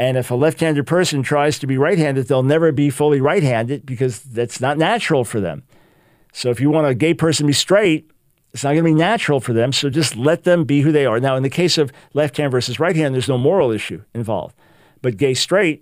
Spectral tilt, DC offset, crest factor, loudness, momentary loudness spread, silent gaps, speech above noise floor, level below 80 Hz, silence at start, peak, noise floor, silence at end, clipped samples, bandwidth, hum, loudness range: -5.5 dB/octave; under 0.1%; 16 dB; -17 LUFS; 9 LU; none; 38 dB; -56 dBFS; 0 s; -2 dBFS; -54 dBFS; 0.05 s; under 0.1%; 16 kHz; none; 3 LU